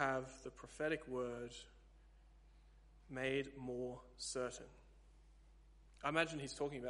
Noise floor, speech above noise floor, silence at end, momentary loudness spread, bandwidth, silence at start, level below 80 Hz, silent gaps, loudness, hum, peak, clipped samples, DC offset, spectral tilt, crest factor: -65 dBFS; 21 dB; 0 s; 15 LU; 11.5 kHz; 0 s; -64 dBFS; none; -44 LUFS; none; -18 dBFS; under 0.1%; under 0.1%; -4 dB/octave; 28 dB